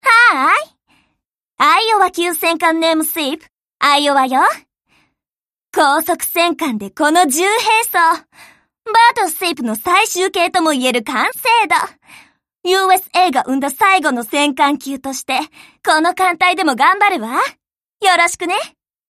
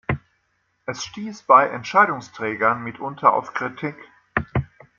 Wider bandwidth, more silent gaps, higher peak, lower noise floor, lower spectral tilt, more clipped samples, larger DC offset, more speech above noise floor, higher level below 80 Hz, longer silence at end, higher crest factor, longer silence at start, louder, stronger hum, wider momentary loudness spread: first, 15.5 kHz vs 7.4 kHz; neither; about the same, 0 dBFS vs -2 dBFS; first, under -90 dBFS vs -69 dBFS; second, -1.5 dB/octave vs -5.5 dB/octave; neither; neither; first, over 75 dB vs 48 dB; second, -62 dBFS vs -48 dBFS; about the same, 0.4 s vs 0.35 s; second, 14 dB vs 20 dB; about the same, 0.05 s vs 0.1 s; first, -14 LUFS vs -21 LUFS; neither; second, 10 LU vs 16 LU